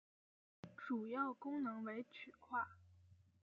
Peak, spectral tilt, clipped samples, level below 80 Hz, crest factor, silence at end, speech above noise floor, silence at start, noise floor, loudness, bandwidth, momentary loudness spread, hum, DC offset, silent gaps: -28 dBFS; -4.5 dB/octave; under 0.1%; under -90 dBFS; 18 dB; 0.25 s; 24 dB; 0.65 s; -69 dBFS; -46 LUFS; 7 kHz; 13 LU; none; under 0.1%; none